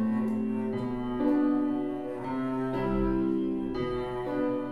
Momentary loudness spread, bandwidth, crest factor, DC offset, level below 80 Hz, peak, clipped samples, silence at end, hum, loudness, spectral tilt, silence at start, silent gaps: 6 LU; 11 kHz; 14 dB; 0.3%; -46 dBFS; -16 dBFS; under 0.1%; 0 s; none; -30 LUFS; -9 dB/octave; 0 s; none